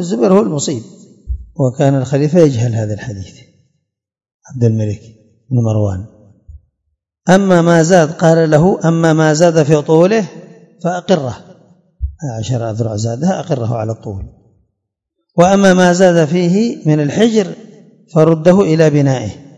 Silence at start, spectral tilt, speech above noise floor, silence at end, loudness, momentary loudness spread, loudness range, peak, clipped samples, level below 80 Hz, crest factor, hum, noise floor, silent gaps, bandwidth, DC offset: 0 s; -6.5 dB/octave; 61 dB; 0.15 s; -12 LUFS; 17 LU; 9 LU; 0 dBFS; 0.6%; -38 dBFS; 14 dB; none; -73 dBFS; 4.34-4.40 s; 10.5 kHz; under 0.1%